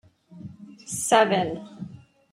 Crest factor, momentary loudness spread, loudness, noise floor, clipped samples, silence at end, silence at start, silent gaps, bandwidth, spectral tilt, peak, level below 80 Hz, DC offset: 22 dB; 24 LU; -23 LUFS; -44 dBFS; under 0.1%; 0.35 s; 0.3 s; none; 16 kHz; -3.5 dB/octave; -4 dBFS; -64 dBFS; under 0.1%